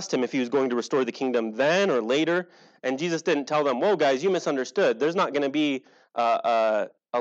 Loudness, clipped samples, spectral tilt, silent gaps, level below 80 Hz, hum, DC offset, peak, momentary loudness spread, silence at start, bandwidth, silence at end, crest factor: -25 LUFS; under 0.1%; -4.5 dB/octave; none; under -90 dBFS; none; under 0.1%; -10 dBFS; 6 LU; 0 s; 8.2 kHz; 0 s; 14 dB